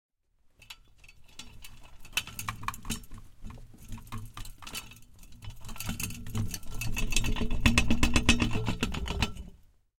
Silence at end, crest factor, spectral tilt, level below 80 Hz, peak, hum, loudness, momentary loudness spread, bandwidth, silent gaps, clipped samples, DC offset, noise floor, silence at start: 0.45 s; 26 dB; -3.5 dB/octave; -36 dBFS; -6 dBFS; none; -31 LUFS; 24 LU; 17 kHz; none; under 0.1%; under 0.1%; -66 dBFS; 0.7 s